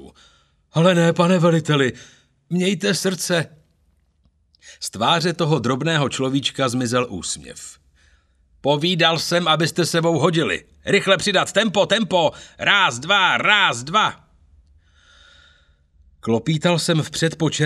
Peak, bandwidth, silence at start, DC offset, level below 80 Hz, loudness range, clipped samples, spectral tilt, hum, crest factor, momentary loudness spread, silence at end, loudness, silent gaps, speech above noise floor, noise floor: 0 dBFS; 14 kHz; 0 s; under 0.1%; -56 dBFS; 6 LU; under 0.1%; -4.5 dB/octave; none; 20 dB; 10 LU; 0 s; -19 LUFS; none; 43 dB; -62 dBFS